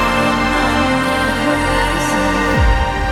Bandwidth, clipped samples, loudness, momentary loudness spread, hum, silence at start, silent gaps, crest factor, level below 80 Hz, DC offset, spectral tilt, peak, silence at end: 16.5 kHz; under 0.1%; -15 LUFS; 1 LU; none; 0 s; none; 12 dB; -22 dBFS; under 0.1%; -5 dB/octave; -2 dBFS; 0 s